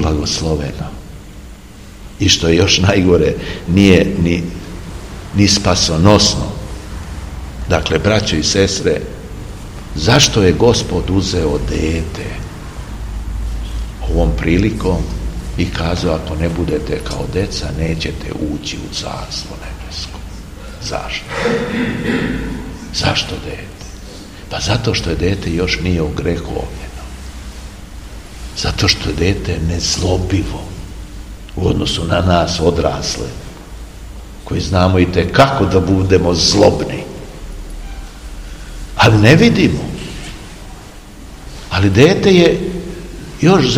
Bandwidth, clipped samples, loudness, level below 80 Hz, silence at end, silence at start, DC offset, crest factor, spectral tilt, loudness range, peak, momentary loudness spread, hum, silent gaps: 16 kHz; 0.2%; -15 LUFS; -26 dBFS; 0 s; 0 s; 0.3%; 16 dB; -5 dB/octave; 8 LU; 0 dBFS; 22 LU; none; none